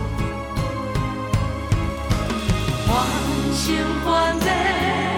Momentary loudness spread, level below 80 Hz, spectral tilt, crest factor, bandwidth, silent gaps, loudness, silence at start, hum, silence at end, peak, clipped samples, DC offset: 6 LU; -30 dBFS; -5 dB/octave; 14 dB; 18 kHz; none; -22 LUFS; 0 s; none; 0 s; -6 dBFS; under 0.1%; under 0.1%